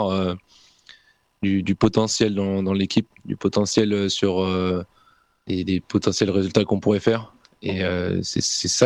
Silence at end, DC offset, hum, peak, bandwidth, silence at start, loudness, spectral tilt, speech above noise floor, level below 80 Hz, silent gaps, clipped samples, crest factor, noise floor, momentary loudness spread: 0 s; under 0.1%; none; -2 dBFS; 11.5 kHz; 0 s; -22 LUFS; -5 dB/octave; 38 dB; -52 dBFS; none; under 0.1%; 20 dB; -59 dBFS; 8 LU